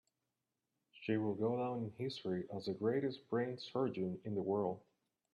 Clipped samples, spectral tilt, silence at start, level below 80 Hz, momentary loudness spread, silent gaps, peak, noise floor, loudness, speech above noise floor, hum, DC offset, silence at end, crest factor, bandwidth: under 0.1%; -8 dB/octave; 0.95 s; -80 dBFS; 6 LU; none; -24 dBFS; -89 dBFS; -40 LUFS; 50 dB; none; under 0.1%; 0.55 s; 18 dB; 11.5 kHz